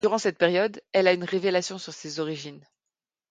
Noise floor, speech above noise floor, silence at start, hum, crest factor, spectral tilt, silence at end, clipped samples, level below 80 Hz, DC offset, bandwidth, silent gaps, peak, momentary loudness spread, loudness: -88 dBFS; 63 dB; 0.05 s; none; 20 dB; -4 dB/octave; 0.7 s; under 0.1%; -74 dBFS; under 0.1%; 9.4 kHz; none; -6 dBFS; 14 LU; -25 LUFS